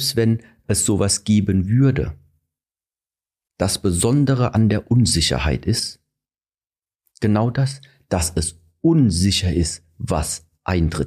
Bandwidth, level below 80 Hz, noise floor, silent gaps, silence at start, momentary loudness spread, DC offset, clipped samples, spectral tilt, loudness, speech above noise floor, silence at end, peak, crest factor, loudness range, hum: 15.5 kHz; -36 dBFS; under -90 dBFS; none; 0 s; 9 LU; under 0.1%; under 0.1%; -5 dB/octave; -19 LUFS; over 72 dB; 0 s; -6 dBFS; 14 dB; 3 LU; none